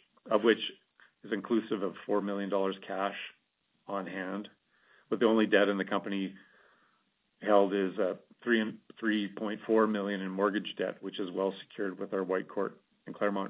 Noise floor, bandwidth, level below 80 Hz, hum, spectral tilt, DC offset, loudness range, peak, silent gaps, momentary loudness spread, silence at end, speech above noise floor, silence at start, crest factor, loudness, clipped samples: -76 dBFS; 4 kHz; -82 dBFS; none; -3.5 dB/octave; under 0.1%; 4 LU; -10 dBFS; none; 12 LU; 0 s; 45 dB; 0.25 s; 22 dB; -32 LUFS; under 0.1%